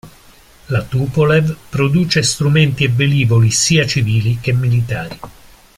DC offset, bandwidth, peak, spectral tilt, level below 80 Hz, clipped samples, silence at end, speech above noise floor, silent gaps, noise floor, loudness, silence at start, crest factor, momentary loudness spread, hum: under 0.1%; 15.5 kHz; -2 dBFS; -5 dB/octave; -42 dBFS; under 0.1%; 0.45 s; 30 dB; none; -44 dBFS; -14 LUFS; 0.05 s; 14 dB; 9 LU; none